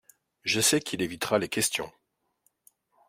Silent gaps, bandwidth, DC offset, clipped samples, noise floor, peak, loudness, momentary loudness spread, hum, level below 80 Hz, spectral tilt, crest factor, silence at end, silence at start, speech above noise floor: none; 16 kHz; under 0.1%; under 0.1%; -73 dBFS; -8 dBFS; -27 LUFS; 11 LU; none; -64 dBFS; -2.5 dB/octave; 22 dB; 1.2 s; 0.45 s; 45 dB